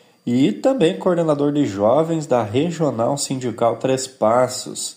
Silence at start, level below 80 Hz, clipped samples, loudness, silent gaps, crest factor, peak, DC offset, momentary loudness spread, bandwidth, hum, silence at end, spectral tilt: 0.25 s; -62 dBFS; under 0.1%; -19 LUFS; none; 16 dB; -4 dBFS; under 0.1%; 5 LU; 16 kHz; none; 0.05 s; -5.5 dB/octave